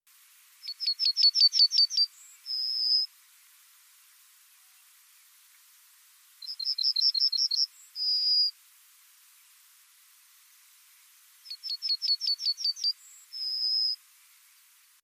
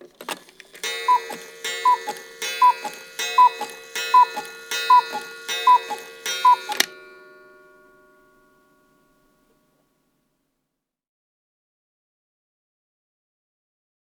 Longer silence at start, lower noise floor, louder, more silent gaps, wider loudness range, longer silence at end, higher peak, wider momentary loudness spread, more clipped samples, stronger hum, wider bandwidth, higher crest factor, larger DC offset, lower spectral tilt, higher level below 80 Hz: first, 0.65 s vs 0.2 s; second, -61 dBFS vs -81 dBFS; second, -25 LUFS vs -20 LUFS; neither; first, 11 LU vs 6 LU; second, 1.1 s vs 7.15 s; second, -12 dBFS vs -2 dBFS; first, 19 LU vs 16 LU; neither; neither; second, 15.5 kHz vs over 20 kHz; second, 18 dB vs 24 dB; neither; second, 10.5 dB/octave vs 1 dB/octave; second, under -90 dBFS vs -76 dBFS